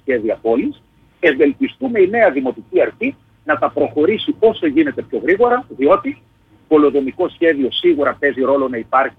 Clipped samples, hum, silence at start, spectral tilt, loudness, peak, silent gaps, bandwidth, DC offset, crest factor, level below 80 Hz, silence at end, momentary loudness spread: under 0.1%; none; 0.05 s; -7.5 dB/octave; -16 LUFS; -2 dBFS; none; 4.2 kHz; under 0.1%; 14 dB; -54 dBFS; 0.1 s; 7 LU